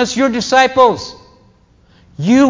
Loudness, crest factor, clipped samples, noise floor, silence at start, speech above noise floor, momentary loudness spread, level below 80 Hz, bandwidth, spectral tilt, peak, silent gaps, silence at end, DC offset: -13 LUFS; 14 dB; under 0.1%; -49 dBFS; 0 s; 38 dB; 14 LU; -48 dBFS; 7.6 kHz; -4.5 dB/octave; 0 dBFS; none; 0 s; under 0.1%